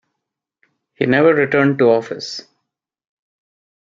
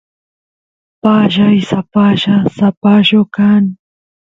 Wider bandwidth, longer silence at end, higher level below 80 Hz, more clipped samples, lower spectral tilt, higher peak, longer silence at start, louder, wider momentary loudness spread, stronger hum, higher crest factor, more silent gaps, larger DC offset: about the same, 7.6 kHz vs 7.4 kHz; first, 1.45 s vs 0.5 s; second, -62 dBFS vs -50 dBFS; neither; about the same, -6.5 dB/octave vs -7.5 dB/octave; about the same, -2 dBFS vs 0 dBFS; about the same, 1 s vs 1.05 s; second, -15 LUFS vs -11 LUFS; first, 14 LU vs 5 LU; neither; first, 18 dB vs 12 dB; second, none vs 2.77-2.81 s; neither